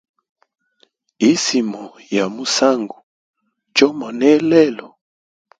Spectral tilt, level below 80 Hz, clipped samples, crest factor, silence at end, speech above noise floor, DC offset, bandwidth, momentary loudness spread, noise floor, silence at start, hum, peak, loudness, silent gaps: -3.5 dB/octave; -64 dBFS; under 0.1%; 18 dB; 0.7 s; 44 dB; under 0.1%; 9.4 kHz; 11 LU; -60 dBFS; 1.2 s; none; 0 dBFS; -16 LUFS; 3.03-3.33 s